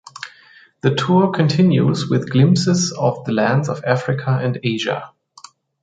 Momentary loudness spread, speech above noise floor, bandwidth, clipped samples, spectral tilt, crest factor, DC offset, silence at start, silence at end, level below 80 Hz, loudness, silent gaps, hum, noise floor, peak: 8 LU; 32 dB; 9.2 kHz; under 0.1%; -6 dB/octave; 16 dB; under 0.1%; 0.2 s; 0.75 s; -58 dBFS; -17 LUFS; none; none; -49 dBFS; -2 dBFS